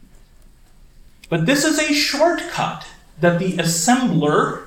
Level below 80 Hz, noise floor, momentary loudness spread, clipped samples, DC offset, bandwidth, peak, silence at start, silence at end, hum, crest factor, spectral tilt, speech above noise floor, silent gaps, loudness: -48 dBFS; -47 dBFS; 8 LU; under 0.1%; under 0.1%; 17 kHz; -2 dBFS; 1.3 s; 0 s; none; 18 dB; -4 dB/octave; 29 dB; none; -18 LUFS